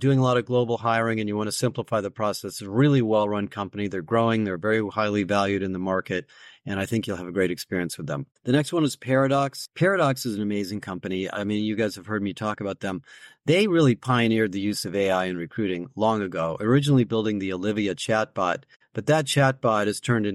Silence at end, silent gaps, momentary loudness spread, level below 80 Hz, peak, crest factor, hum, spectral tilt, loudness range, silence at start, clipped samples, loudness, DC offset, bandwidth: 0 s; 18.76-18.80 s; 9 LU; -62 dBFS; -8 dBFS; 16 dB; none; -6 dB/octave; 3 LU; 0 s; under 0.1%; -24 LUFS; under 0.1%; 14.5 kHz